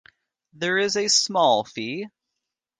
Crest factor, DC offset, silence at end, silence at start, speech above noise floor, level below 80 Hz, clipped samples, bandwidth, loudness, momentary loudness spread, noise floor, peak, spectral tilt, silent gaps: 18 dB; under 0.1%; 0.7 s; 0.6 s; 61 dB; -72 dBFS; under 0.1%; 11 kHz; -21 LUFS; 13 LU; -83 dBFS; -6 dBFS; -2 dB/octave; none